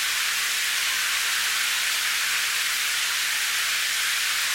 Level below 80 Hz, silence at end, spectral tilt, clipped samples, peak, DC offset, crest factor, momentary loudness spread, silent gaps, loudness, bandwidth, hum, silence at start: -64 dBFS; 0 s; 3.5 dB/octave; under 0.1%; -12 dBFS; under 0.1%; 14 dB; 1 LU; none; -22 LUFS; 17 kHz; none; 0 s